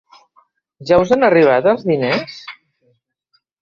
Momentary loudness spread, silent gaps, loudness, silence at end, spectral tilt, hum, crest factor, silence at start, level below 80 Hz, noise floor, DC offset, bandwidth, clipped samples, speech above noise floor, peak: 22 LU; none; -14 LUFS; 1.1 s; -6.5 dB/octave; none; 16 dB; 0.8 s; -50 dBFS; -65 dBFS; under 0.1%; 7.2 kHz; under 0.1%; 51 dB; -2 dBFS